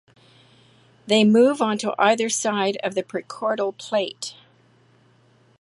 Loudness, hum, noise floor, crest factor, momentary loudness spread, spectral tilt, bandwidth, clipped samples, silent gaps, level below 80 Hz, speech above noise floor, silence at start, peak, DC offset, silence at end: -21 LUFS; none; -57 dBFS; 20 dB; 13 LU; -4 dB/octave; 11.5 kHz; under 0.1%; none; -72 dBFS; 37 dB; 1.05 s; -4 dBFS; under 0.1%; 1.3 s